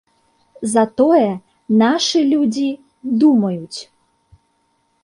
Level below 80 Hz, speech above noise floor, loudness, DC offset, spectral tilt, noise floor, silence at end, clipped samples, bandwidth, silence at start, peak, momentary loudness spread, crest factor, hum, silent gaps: -62 dBFS; 49 dB; -16 LUFS; under 0.1%; -5 dB/octave; -64 dBFS; 1.2 s; under 0.1%; 11.5 kHz; 0.6 s; -2 dBFS; 15 LU; 14 dB; none; none